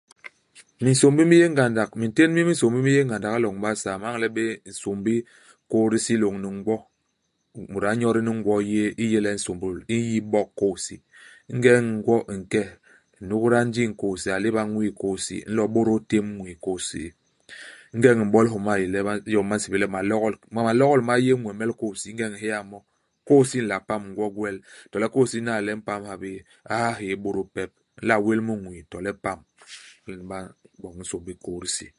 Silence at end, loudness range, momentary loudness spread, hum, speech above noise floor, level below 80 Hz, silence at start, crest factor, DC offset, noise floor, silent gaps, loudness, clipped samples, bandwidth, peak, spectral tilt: 0.1 s; 6 LU; 17 LU; none; 50 dB; -56 dBFS; 0.25 s; 22 dB; under 0.1%; -73 dBFS; none; -23 LUFS; under 0.1%; 11.5 kHz; -2 dBFS; -5.5 dB/octave